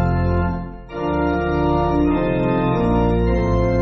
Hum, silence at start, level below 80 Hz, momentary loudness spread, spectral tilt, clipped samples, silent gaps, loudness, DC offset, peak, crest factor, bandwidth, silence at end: none; 0 s; -26 dBFS; 6 LU; -7.5 dB/octave; under 0.1%; none; -19 LUFS; under 0.1%; -6 dBFS; 12 dB; 6.6 kHz; 0 s